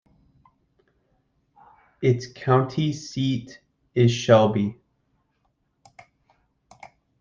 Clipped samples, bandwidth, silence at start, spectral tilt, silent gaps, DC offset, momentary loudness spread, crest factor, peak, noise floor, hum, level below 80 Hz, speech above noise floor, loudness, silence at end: under 0.1%; 7.4 kHz; 2 s; -6.5 dB/octave; none; under 0.1%; 12 LU; 22 dB; -2 dBFS; -71 dBFS; none; -62 dBFS; 50 dB; -22 LUFS; 2.5 s